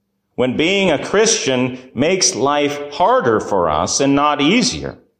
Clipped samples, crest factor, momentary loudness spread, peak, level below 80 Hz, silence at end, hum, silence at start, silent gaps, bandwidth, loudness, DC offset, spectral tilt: under 0.1%; 14 dB; 7 LU; -4 dBFS; -44 dBFS; 0.25 s; none; 0.4 s; none; 15.5 kHz; -15 LUFS; under 0.1%; -3 dB/octave